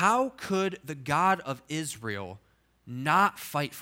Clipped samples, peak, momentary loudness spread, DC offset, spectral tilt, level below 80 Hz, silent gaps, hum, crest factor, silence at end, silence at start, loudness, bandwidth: under 0.1%; -8 dBFS; 14 LU; under 0.1%; -4.5 dB/octave; -66 dBFS; none; none; 20 dB; 0 s; 0 s; -29 LUFS; 17 kHz